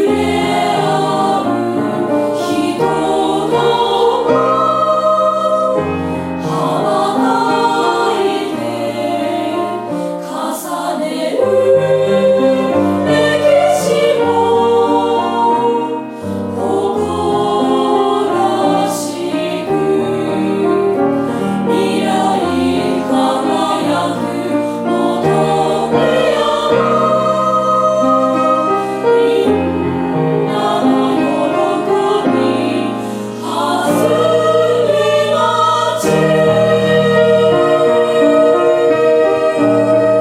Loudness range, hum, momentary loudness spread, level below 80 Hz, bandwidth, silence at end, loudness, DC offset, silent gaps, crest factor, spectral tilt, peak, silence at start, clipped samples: 4 LU; none; 7 LU; -50 dBFS; 16 kHz; 0 s; -14 LUFS; under 0.1%; none; 12 dB; -5.5 dB/octave; -2 dBFS; 0 s; under 0.1%